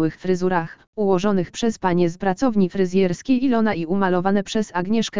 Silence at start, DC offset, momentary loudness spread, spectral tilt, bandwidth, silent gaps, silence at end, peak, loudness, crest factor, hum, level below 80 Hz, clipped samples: 0 s; 2%; 4 LU; -6.5 dB/octave; 7.6 kHz; 0.87-0.93 s; 0 s; -4 dBFS; -21 LUFS; 16 dB; none; -50 dBFS; under 0.1%